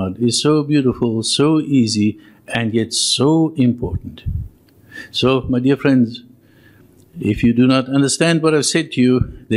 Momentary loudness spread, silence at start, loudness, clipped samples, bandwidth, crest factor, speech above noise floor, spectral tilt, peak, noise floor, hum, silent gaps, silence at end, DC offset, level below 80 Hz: 11 LU; 0 s; -16 LUFS; under 0.1%; 12.5 kHz; 16 dB; 32 dB; -5 dB/octave; 0 dBFS; -48 dBFS; none; none; 0 s; under 0.1%; -40 dBFS